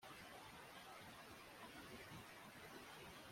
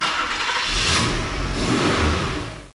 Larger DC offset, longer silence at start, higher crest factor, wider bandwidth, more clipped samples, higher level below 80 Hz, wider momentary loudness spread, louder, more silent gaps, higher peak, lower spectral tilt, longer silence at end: neither; about the same, 0 s vs 0 s; about the same, 14 dB vs 14 dB; first, 16.5 kHz vs 11.5 kHz; neither; second, -78 dBFS vs -32 dBFS; second, 2 LU vs 7 LU; second, -58 LUFS vs -21 LUFS; neither; second, -44 dBFS vs -8 dBFS; about the same, -3.5 dB/octave vs -3.5 dB/octave; about the same, 0 s vs 0.05 s